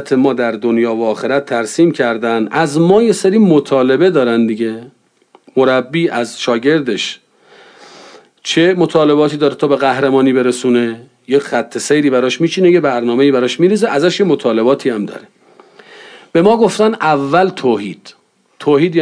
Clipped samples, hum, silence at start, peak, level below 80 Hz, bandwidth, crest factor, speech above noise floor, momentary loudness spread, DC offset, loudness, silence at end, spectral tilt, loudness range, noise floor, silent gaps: under 0.1%; none; 0 s; 0 dBFS; -60 dBFS; 10.5 kHz; 12 dB; 38 dB; 8 LU; under 0.1%; -13 LUFS; 0 s; -5.5 dB/octave; 4 LU; -50 dBFS; none